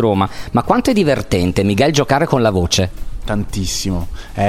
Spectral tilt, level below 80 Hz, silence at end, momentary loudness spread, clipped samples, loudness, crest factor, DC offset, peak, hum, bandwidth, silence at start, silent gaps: -5 dB/octave; -30 dBFS; 0 s; 9 LU; under 0.1%; -16 LUFS; 16 dB; under 0.1%; 0 dBFS; none; 16 kHz; 0 s; none